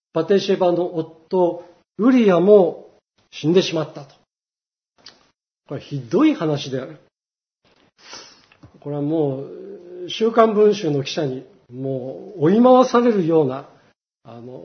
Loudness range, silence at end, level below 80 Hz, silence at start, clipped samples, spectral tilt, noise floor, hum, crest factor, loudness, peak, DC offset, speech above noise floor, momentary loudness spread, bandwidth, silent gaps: 8 LU; 0 s; -70 dBFS; 0.15 s; under 0.1%; -6.5 dB/octave; under -90 dBFS; none; 20 dB; -18 LUFS; 0 dBFS; under 0.1%; over 72 dB; 24 LU; 6.6 kHz; none